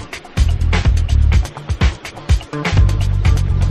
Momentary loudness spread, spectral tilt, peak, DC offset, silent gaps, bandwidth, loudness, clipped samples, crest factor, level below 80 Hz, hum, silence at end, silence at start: 5 LU; -6 dB/octave; -2 dBFS; under 0.1%; none; 12 kHz; -17 LUFS; under 0.1%; 14 dB; -16 dBFS; none; 0 s; 0 s